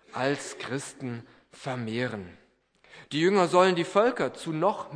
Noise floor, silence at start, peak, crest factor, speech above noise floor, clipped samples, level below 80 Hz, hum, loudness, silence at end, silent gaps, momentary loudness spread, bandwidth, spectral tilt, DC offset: -61 dBFS; 0.15 s; -8 dBFS; 20 dB; 34 dB; under 0.1%; -70 dBFS; none; -27 LUFS; 0 s; none; 16 LU; 10.5 kHz; -5 dB/octave; under 0.1%